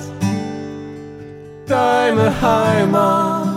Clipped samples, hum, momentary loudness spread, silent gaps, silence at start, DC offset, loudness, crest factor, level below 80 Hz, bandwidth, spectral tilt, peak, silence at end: under 0.1%; none; 20 LU; none; 0 s; under 0.1%; -16 LUFS; 14 dB; -44 dBFS; 16 kHz; -6.5 dB/octave; -2 dBFS; 0 s